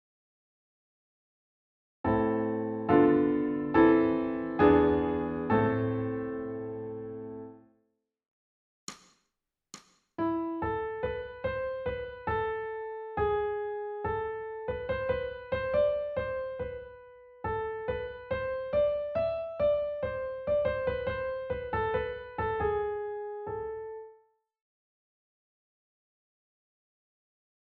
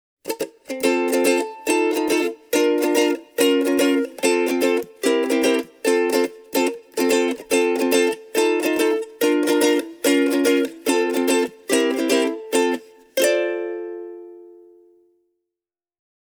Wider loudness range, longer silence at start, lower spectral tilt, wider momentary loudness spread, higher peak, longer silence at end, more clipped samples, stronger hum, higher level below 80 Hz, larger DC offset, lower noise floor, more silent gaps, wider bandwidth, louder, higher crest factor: first, 15 LU vs 4 LU; first, 2.05 s vs 0.25 s; first, -6 dB/octave vs -2 dB/octave; first, 15 LU vs 7 LU; second, -10 dBFS vs -4 dBFS; first, 3.6 s vs 1.85 s; neither; neither; first, -52 dBFS vs -68 dBFS; neither; second, -84 dBFS vs -89 dBFS; first, 8.28-8.87 s vs none; second, 7.2 kHz vs over 20 kHz; second, -31 LUFS vs -20 LUFS; first, 22 dB vs 16 dB